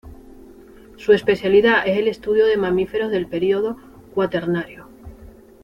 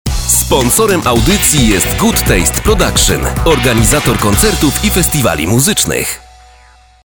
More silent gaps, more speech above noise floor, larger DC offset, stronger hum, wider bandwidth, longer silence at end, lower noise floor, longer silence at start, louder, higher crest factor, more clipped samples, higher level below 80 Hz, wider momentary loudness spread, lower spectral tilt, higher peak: neither; second, 26 dB vs 32 dB; second, under 0.1% vs 0.6%; neither; second, 7.2 kHz vs over 20 kHz; second, 0.4 s vs 0.85 s; about the same, -44 dBFS vs -43 dBFS; about the same, 0.05 s vs 0.05 s; second, -19 LUFS vs -10 LUFS; first, 18 dB vs 12 dB; second, under 0.1% vs 0.2%; second, -48 dBFS vs -20 dBFS; first, 12 LU vs 3 LU; first, -7 dB/octave vs -3.5 dB/octave; about the same, -2 dBFS vs 0 dBFS